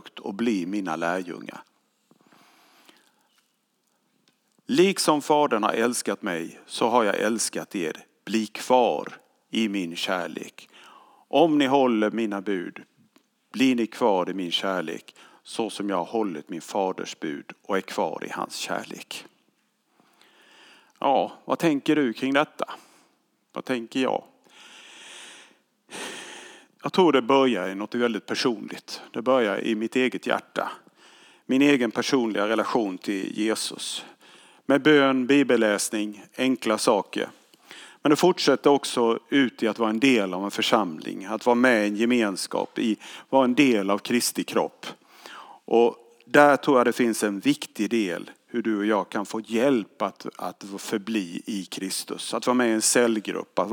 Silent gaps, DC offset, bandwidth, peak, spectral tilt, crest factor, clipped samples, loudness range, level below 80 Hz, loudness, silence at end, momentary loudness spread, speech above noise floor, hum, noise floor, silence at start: none; under 0.1%; 19.5 kHz; -2 dBFS; -4 dB/octave; 22 dB; under 0.1%; 8 LU; -90 dBFS; -24 LUFS; 0 s; 16 LU; 48 dB; none; -71 dBFS; 0.05 s